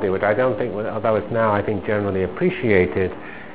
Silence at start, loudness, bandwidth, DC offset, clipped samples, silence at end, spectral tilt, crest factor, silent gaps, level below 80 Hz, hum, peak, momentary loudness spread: 0 s; -21 LUFS; 4 kHz; 0.9%; under 0.1%; 0 s; -11 dB/octave; 18 dB; none; -44 dBFS; none; -2 dBFS; 7 LU